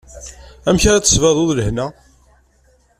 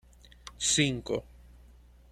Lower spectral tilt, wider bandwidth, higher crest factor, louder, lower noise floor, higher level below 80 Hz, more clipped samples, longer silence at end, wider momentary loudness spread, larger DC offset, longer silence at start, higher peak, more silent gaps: about the same, -4 dB/octave vs -3 dB/octave; about the same, 14.5 kHz vs 14.5 kHz; second, 16 dB vs 22 dB; first, -15 LUFS vs -29 LUFS; about the same, -55 dBFS vs -55 dBFS; first, -30 dBFS vs -54 dBFS; neither; first, 1.1 s vs 0.9 s; about the same, 23 LU vs 24 LU; neither; second, 0.15 s vs 0.45 s; first, 0 dBFS vs -12 dBFS; neither